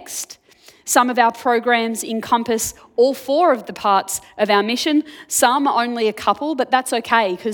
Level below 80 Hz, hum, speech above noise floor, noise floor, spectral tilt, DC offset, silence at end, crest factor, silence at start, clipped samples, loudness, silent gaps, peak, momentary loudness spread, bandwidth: -60 dBFS; none; 32 dB; -50 dBFS; -2.5 dB/octave; under 0.1%; 0 s; 18 dB; 0 s; under 0.1%; -18 LUFS; none; 0 dBFS; 7 LU; 19 kHz